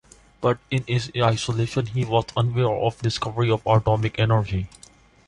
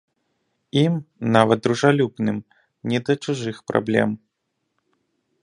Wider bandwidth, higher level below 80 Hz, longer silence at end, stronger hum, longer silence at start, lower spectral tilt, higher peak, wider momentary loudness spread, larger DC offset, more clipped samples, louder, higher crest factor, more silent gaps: about the same, 11 kHz vs 11 kHz; first, -44 dBFS vs -62 dBFS; second, 0.6 s vs 1.25 s; neither; second, 0.4 s vs 0.75 s; about the same, -6 dB/octave vs -6.5 dB/octave; second, -6 dBFS vs 0 dBFS; second, 6 LU vs 9 LU; neither; neither; about the same, -23 LUFS vs -21 LUFS; second, 16 dB vs 22 dB; neither